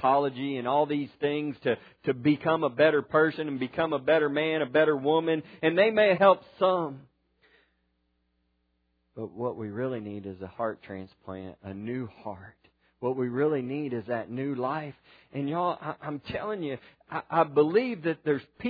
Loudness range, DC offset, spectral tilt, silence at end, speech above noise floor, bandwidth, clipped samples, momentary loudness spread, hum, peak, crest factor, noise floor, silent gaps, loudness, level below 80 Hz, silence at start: 12 LU; under 0.1%; -9.5 dB/octave; 0 s; 47 dB; 5 kHz; under 0.1%; 18 LU; none; -8 dBFS; 22 dB; -74 dBFS; none; -28 LUFS; -68 dBFS; 0 s